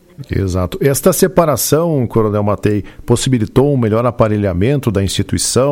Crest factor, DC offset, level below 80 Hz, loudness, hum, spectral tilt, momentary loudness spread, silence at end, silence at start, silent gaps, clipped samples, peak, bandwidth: 14 dB; under 0.1%; -34 dBFS; -14 LUFS; none; -5.5 dB/octave; 6 LU; 0 s; 0.2 s; none; under 0.1%; 0 dBFS; 16.5 kHz